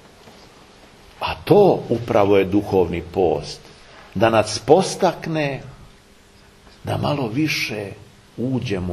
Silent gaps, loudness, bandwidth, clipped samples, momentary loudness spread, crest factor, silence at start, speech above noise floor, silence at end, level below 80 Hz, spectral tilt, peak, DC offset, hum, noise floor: none; -19 LUFS; 13.5 kHz; under 0.1%; 16 LU; 20 dB; 0.25 s; 31 dB; 0 s; -48 dBFS; -5.5 dB/octave; 0 dBFS; under 0.1%; none; -49 dBFS